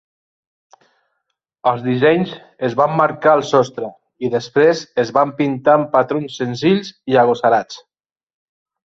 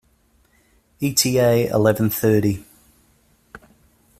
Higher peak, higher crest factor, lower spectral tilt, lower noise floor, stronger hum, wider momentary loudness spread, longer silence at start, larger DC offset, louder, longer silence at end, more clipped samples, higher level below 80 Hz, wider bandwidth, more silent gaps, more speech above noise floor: about the same, -2 dBFS vs -2 dBFS; about the same, 16 dB vs 18 dB; about the same, -6 dB/octave vs -5 dB/octave; first, -74 dBFS vs -60 dBFS; neither; about the same, 10 LU vs 8 LU; first, 1.65 s vs 1 s; neither; first, -16 LUFS vs -19 LUFS; first, 1.15 s vs 0.6 s; neither; second, -60 dBFS vs -52 dBFS; second, 7.8 kHz vs 16 kHz; neither; first, 58 dB vs 42 dB